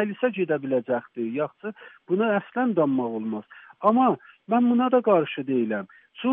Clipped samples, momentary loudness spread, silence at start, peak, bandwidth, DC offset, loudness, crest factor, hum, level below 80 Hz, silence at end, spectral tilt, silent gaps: under 0.1%; 12 LU; 0 s; -6 dBFS; 3.7 kHz; under 0.1%; -24 LUFS; 18 dB; none; -78 dBFS; 0 s; -5.5 dB/octave; none